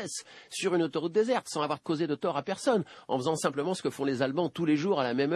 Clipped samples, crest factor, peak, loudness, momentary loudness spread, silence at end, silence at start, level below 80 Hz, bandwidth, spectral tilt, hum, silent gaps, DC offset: under 0.1%; 18 dB; -12 dBFS; -30 LUFS; 5 LU; 0 s; 0 s; -76 dBFS; 12 kHz; -5 dB/octave; none; none; under 0.1%